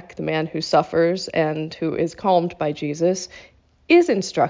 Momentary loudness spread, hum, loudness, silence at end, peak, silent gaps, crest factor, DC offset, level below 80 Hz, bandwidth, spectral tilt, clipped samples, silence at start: 9 LU; none; -21 LUFS; 0 s; -4 dBFS; none; 16 dB; under 0.1%; -56 dBFS; 7.6 kHz; -5.5 dB/octave; under 0.1%; 0 s